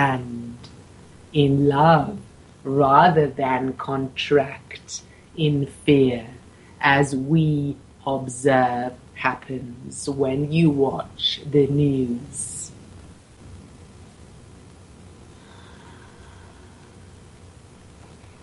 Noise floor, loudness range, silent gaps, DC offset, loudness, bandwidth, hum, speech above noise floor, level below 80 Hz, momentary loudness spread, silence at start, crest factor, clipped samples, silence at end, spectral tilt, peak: -46 dBFS; 6 LU; none; under 0.1%; -21 LUFS; 11.5 kHz; none; 26 dB; -52 dBFS; 17 LU; 0 s; 22 dB; under 0.1%; 1.75 s; -6 dB/octave; 0 dBFS